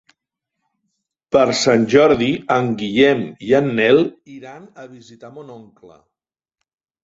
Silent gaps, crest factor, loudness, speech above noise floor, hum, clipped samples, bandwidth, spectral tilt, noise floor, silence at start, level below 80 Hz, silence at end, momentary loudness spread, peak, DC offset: none; 18 dB; -16 LUFS; 62 dB; none; under 0.1%; 8 kHz; -5 dB/octave; -79 dBFS; 1.35 s; -54 dBFS; 1.4 s; 24 LU; 0 dBFS; under 0.1%